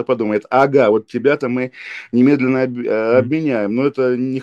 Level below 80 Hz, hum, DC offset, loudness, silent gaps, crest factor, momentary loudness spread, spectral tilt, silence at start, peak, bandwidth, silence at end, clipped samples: -64 dBFS; none; under 0.1%; -16 LUFS; none; 16 dB; 7 LU; -8 dB/octave; 0 s; 0 dBFS; 7.4 kHz; 0 s; under 0.1%